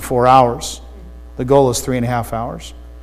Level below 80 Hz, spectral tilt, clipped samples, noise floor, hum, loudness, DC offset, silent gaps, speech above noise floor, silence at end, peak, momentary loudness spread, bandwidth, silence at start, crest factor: -34 dBFS; -5.5 dB/octave; under 0.1%; -35 dBFS; none; -15 LUFS; under 0.1%; none; 20 dB; 0 s; 0 dBFS; 21 LU; 15.5 kHz; 0 s; 16 dB